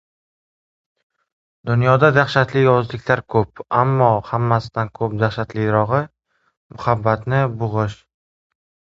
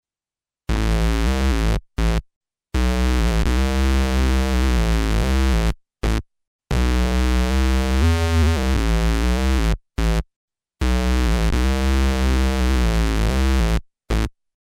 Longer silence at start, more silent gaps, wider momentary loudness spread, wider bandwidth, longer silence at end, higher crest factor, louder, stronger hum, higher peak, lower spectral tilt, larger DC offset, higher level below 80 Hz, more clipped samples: first, 1.65 s vs 0.7 s; second, 6.57-6.70 s vs 2.36-2.41 s, 6.47-6.59 s, 10.36-10.48 s; first, 9 LU vs 6 LU; second, 7.6 kHz vs 15 kHz; first, 1.05 s vs 0.45 s; first, 20 dB vs 12 dB; first, -18 LUFS vs -21 LUFS; neither; first, 0 dBFS vs -8 dBFS; first, -8 dB/octave vs -6 dB/octave; neither; second, -48 dBFS vs -20 dBFS; neither